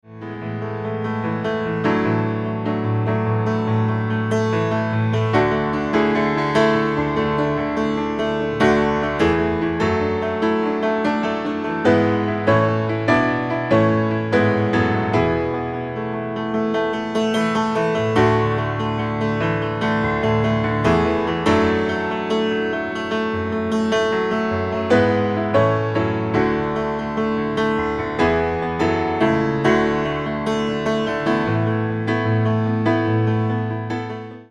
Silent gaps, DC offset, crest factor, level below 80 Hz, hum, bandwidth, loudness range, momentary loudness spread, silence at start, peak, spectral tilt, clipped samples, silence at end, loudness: none; under 0.1%; 18 dB; -44 dBFS; none; 10 kHz; 2 LU; 6 LU; 0.05 s; -2 dBFS; -7 dB/octave; under 0.1%; 0.05 s; -20 LUFS